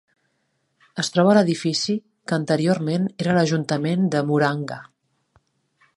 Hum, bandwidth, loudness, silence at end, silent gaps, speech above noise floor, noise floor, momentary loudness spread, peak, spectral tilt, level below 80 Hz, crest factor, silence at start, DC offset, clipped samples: none; 11.5 kHz; -21 LUFS; 1.15 s; none; 50 dB; -71 dBFS; 12 LU; -2 dBFS; -5.5 dB/octave; -66 dBFS; 20 dB; 0.95 s; under 0.1%; under 0.1%